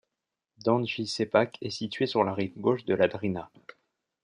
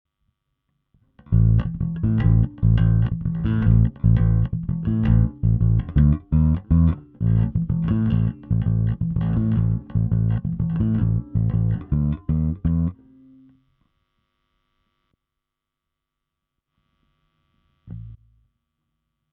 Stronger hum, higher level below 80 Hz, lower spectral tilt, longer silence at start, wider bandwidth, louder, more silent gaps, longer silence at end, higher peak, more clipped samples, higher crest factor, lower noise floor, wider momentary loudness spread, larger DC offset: neither; second, -70 dBFS vs -30 dBFS; second, -6 dB/octave vs -11 dB/octave; second, 0.65 s vs 1.3 s; first, 10.5 kHz vs 3.5 kHz; second, -28 LUFS vs -21 LUFS; neither; second, 0.8 s vs 1.15 s; second, -8 dBFS vs -4 dBFS; neither; about the same, 22 dB vs 18 dB; first, -87 dBFS vs -83 dBFS; about the same, 8 LU vs 6 LU; neither